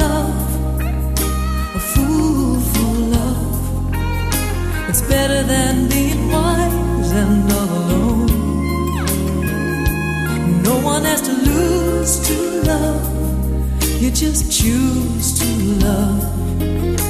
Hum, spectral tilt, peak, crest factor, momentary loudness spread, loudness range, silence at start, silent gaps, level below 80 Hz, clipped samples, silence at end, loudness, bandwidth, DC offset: none; -5 dB/octave; -2 dBFS; 14 dB; 5 LU; 2 LU; 0 s; none; -22 dBFS; under 0.1%; 0 s; -17 LUFS; 14.5 kHz; under 0.1%